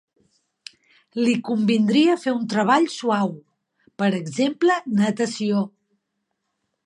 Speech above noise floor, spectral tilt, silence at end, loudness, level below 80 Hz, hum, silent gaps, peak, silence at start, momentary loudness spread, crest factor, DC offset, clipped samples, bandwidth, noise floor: 57 dB; -5.5 dB/octave; 1.2 s; -21 LUFS; -72 dBFS; none; none; -6 dBFS; 1.15 s; 6 LU; 18 dB; under 0.1%; under 0.1%; 11 kHz; -77 dBFS